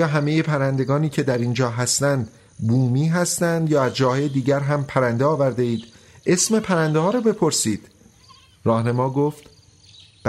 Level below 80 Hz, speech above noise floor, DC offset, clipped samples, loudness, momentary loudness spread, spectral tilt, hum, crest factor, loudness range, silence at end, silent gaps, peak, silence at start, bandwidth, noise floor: -58 dBFS; 31 dB; under 0.1%; under 0.1%; -20 LUFS; 6 LU; -5 dB/octave; none; 16 dB; 1 LU; 0 s; none; -4 dBFS; 0 s; 15 kHz; -51 dBFS